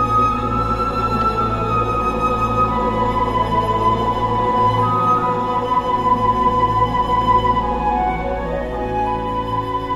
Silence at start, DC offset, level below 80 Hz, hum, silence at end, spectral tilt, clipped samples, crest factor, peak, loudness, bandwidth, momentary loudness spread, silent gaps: 0 s; under 0.1%; -30 dBFS; none; 0 s; -7 dB/octave; under 0.1%; 14 dB; -4 dBFS; -18 LUFS; 12.5 kHz; 6 LU; none